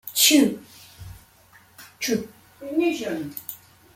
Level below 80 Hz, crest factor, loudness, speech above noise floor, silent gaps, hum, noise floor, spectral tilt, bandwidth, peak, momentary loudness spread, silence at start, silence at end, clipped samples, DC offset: -58 dBFS; 22 dB; -22 LUFS; 32 dB; none; none; -54 dBFS; -2 dB/octave; 16.5 kHz; -4 dBFS; 27 LU; 0.05 s; 0.4 s; under 0.1%; under 0.1%